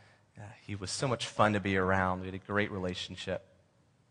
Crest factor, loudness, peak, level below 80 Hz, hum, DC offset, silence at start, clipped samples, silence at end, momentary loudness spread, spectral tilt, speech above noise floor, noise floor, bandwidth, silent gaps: 24 dB; -32 LUFS; -10 dBFS; -64 dBFS; none; under 0.1%; 0.35 s; under 0.1%; 0.7 s; 15 LU; -5 dB/octave; 35 dB; -68 dBFS; 10.5 kHz; none